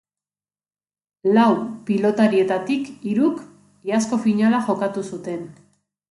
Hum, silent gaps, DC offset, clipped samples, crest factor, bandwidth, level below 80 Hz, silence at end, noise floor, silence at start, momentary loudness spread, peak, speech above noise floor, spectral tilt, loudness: none; none; under 0.1%; under 0.1%; 18 dB; 11.5 kHz; -68 dBFS; 0.6 s; under -90 dBFS; 1.25 s; 14 LU; -4 dBFS; over 71 dB; -6 dB/octave; -20 LUFS